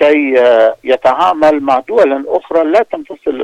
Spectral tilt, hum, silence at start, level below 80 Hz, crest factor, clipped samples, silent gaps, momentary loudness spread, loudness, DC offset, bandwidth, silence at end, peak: -5 dB/octave; none; 0 s; -52 dBFS; 10 dB; under 0.1%; none; 7 LU; -11 LUFS; under 0.1%; 9.4 kHz; 0 s; 0 dBFS